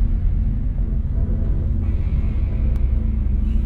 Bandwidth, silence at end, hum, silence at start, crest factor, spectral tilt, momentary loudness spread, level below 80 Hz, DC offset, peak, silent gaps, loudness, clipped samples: 3 kHz; 0 s; none; 0 s; 10 dB; -11 dB/octave; 2 LU; -20 dBFS; under 0.1%; -8 dBFS; none; -23 LUFS; under 0.1%